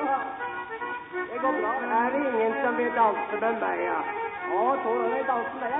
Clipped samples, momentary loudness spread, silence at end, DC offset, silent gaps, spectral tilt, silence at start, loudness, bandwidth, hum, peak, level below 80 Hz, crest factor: under 0.1%; 9 LU; 0 s; under 0.1%; none; -9 dB/octave; 0 s; -27 LUFS; 3.9 kHz; none; -10 dBFS; -68 dBFS; 16 dB